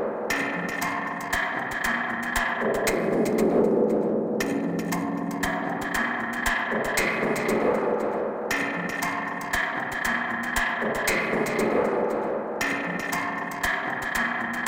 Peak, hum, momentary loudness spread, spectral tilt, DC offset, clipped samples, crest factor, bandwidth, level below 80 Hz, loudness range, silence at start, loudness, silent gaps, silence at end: -10 dBFS; none; 4 LU; -4 dB/octave; under 0.1%; under 0.1%; 16 dB; 17 kHz; -48 dBFS; 2 LU; 0 s; -26 LUFS; none; 0 s